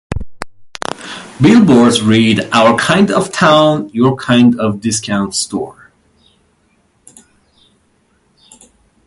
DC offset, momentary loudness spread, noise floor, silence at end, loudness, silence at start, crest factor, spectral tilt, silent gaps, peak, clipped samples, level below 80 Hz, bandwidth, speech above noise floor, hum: under 0.1%; 18 LU; -56 dBFS; 3.35 s; -11 LUFS; 0.1 s; 14 dB; -5 dB/octave; none; 0 dBFS; under 0.1%; -40 dBFS; 11.5 kHz; 46 dB; none